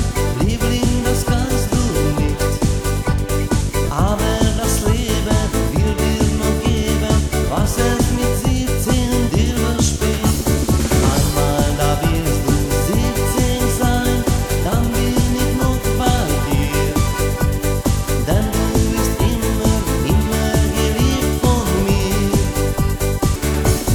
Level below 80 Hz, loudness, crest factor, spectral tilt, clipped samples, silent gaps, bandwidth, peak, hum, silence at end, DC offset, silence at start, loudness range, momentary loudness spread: -22 dBFS; -17 LUFS; 16 dB; -5 dB/octave; under 0.1%; none; 19.5 kHz; -2 dBFS; none; 0 s; under 0.1%; 0 s; 1 LU; 2 LU